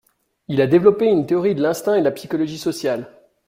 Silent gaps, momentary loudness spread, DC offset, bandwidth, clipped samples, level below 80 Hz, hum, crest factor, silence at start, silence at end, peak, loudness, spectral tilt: none; 10 LU; under 0.1%; 16 kHz; under 0.1%; -58 dBFS; none; 18 dB; 0.5 s; 0.4 s; -2 dBFS; -19 LUFS; -6.5 dB/octave